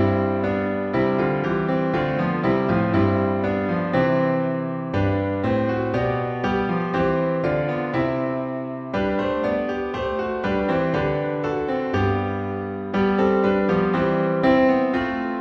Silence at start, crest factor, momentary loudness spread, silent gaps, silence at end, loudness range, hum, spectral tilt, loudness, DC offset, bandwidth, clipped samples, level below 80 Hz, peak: 0 s; 14 dB; 6 LU; none; 0 s; 3 LU; none; -8.5 dB/octave; -22 LUFS; under 0.1%; 6.8 kHz; under 0.1%; -46 dBFS; -8 dBFS